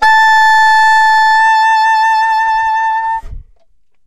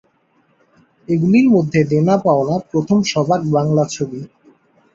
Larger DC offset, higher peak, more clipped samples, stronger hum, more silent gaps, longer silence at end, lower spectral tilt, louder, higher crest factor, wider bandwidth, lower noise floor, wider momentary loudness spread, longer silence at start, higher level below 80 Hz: neither; about the same, -2 dBFS vs -2 dBFS; neither; neither; neither; second, 0 s vs 0.7 s; second, 1 dB/octave vs -7 dB/octave; first, -9 LUFS vs -16 LUFS; second, 8 dB vs 14 dB; first, 14 kHz vs 7.8 kHz; about the same, -58 dBFS vs -59 dBFS; about the same, 7 LU vs 9 LU; second, 0 s vs 1.1 s; first, -38 dBFS vs -56 dBFS